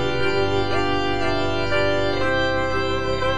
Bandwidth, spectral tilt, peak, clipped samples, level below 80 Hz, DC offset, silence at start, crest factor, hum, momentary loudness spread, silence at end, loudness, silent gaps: 10 kHz; -5.5 dB/octave; -8 dBFS; under 0.1%; -38 dBFS; 5%; 0 s; 12 dB; 50 Hz at -45 dBFS; 2 LU; 0 s; -22 LUFS; none